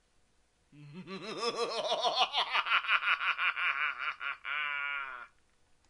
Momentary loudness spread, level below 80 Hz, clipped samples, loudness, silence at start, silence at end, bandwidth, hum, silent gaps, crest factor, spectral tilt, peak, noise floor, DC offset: 15 LU; -76 dBFS; under 0.1%; -31 LUFS; 0.75 s; 0.65 s; 11.5 kHz; none; none; 22 dB; -1.5 dB/octave; -12 dBFS; -70 dBFS; under 0.1%